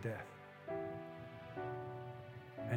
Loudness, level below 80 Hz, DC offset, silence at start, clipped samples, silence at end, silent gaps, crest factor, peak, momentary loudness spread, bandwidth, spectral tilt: -48 LUFS; -76 dBFS; under 0.1%; 0 s; under 0.1%; 0 s; none; 22 dB; -24 dBFS; 8 LU; 16.5 kHz; -8 dB/octave